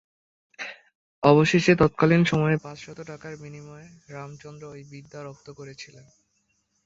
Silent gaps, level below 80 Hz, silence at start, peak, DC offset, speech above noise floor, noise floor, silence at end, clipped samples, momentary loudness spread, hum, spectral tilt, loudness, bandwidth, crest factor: 0.95-1.22 s; -56 dBFS; 0.6 s; -2 dBFS; under 0.1%; 48 dB; -72 dBFS; 1 s; under 0.1%; 24 LU; none; -6.5 dB/octave; -20 LUFS; 7.8 kHz; 24 dB